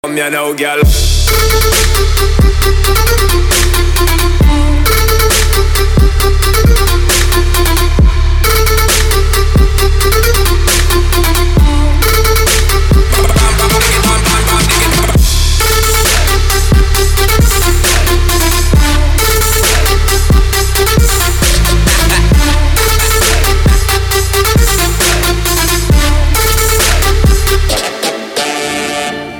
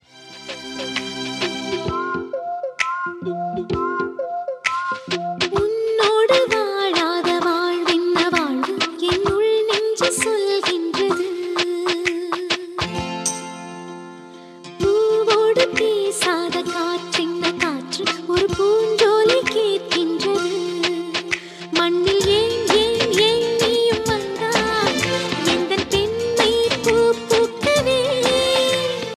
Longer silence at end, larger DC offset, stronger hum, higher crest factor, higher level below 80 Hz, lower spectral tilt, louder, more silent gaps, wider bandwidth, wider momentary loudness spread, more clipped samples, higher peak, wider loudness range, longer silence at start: about the same, 0 s vs 0.05 s; neither; neither; second, 8 dB vs 18 dB; first, -10 dBFS vs -48 dBFS; about the same, -3.5 dB/octave vs -3.5 dB/octave; first, -10 LUFS vs -19 LUFS; neither; first, 19.5 kHz vs 14.5 kHz; second, 2 LU vs 9 LU; neither; about the same, 0 dBFS vs -2 dBFS; second, 1 LU vs 6 LU; about the same, 0.05 s vs 0.15 s